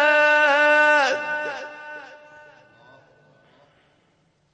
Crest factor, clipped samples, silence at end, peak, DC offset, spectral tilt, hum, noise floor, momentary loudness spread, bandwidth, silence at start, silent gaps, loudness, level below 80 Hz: 18 dB; under 0.1%; 2.5 s; -4 dBFS; under 0.1%; -1.5 dB/octave; none; -64 dBFS; 22 LU; 9.2 kHz; 0 s; none; -18 LUFS; -74 dBFS